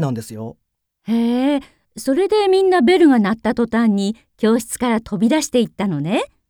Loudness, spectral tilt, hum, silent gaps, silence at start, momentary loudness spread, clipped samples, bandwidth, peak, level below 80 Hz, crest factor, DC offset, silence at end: -17 LUFS; -5.5 dB/octave; none; none; 0 s; 12 LU; under 0.1%; 17.5 kHz; -2 dBFS; -52 dBFS; 14 dB; under 0.1%; 0.25 s